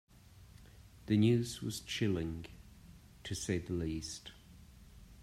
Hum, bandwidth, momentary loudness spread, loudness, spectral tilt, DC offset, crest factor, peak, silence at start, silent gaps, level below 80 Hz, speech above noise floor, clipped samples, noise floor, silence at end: none; 15.5 kHz; 24 LU; -36 LUFS; -5.5 dB/octave; under 0.1%; 18 dB; -20 dBFS; 0.3 s; none; -58 dBFS; 23 dB; under 0.1%; -58 dBFS; 0 s